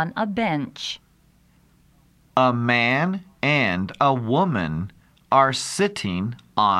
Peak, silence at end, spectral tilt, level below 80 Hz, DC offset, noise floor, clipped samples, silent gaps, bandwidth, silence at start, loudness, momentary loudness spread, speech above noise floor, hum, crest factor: -4 dBFS; 0 s; -5 dB/octave; -56 dBFS; under 0.1%; -58 dBFS; under 0.1%; none; 13.5 kHz; 0 s; -22 LUFS; 11 LU; 37 dB; none; 20 dB